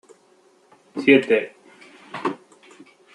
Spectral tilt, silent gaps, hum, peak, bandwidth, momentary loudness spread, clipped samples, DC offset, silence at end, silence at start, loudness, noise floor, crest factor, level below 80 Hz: -6 dB/octave; none; none; -2 dBFS; 10.5 kHz; 21 LU; under 0.1%; under 0.1%; 0.8 s; 0.95 s; -20 LUFS; -57 dBFS; 22 dB; -72 dBFS